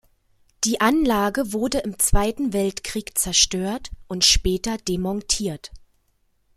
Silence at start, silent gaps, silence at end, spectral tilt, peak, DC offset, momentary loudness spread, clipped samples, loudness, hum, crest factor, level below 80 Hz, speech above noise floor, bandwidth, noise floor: 0.6 s; none; 0.8 s; -3 dB/octave; -2 dBFS; under 0.1%; 11 LU; under 0.1%; -21 LUFS; none; 20 dB; -34 dBFS; 44 dB; 16 kHz; -66 dBFS